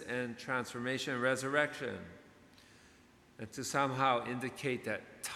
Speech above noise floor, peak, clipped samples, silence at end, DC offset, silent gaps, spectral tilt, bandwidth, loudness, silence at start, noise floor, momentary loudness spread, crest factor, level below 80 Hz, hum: 27 dB; -16 dBFS; under 0.1%; 0 s; under 0.1%; none; -4 dB/octave; 16 kHz; -35 LUFS; 0 s; -63 dBFS; 11 LU; 22 dB; -74 dBFS; none